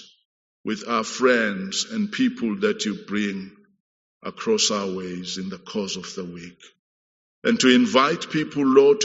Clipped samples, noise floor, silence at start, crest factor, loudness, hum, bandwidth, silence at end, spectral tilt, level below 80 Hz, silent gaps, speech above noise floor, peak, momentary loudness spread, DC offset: under 0.1%; under -90 dBFS; 0 s; 22 dB; -22 LUFS; none; 8 kHz; 0 s; -3 dB/octave; -68 dBFS; 0.25-0.64 s, 3.80-4.20 s, 6.79-7.42 s; over 68 dB; -2 dBFS; 18 LU; under 0.1%